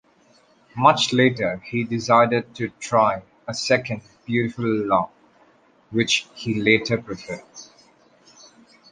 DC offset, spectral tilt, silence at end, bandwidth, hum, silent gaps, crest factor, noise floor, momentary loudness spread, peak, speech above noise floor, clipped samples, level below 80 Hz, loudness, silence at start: under 0.1%; -4.5 dB/octave; 1.3 s; 10 kHz; none; none; 22 dB; -57 dBFS; 16 LU; -2 dBFS; 36 dB; under 0.1%; -60 dBFS; -21 LUFS; 0.75 s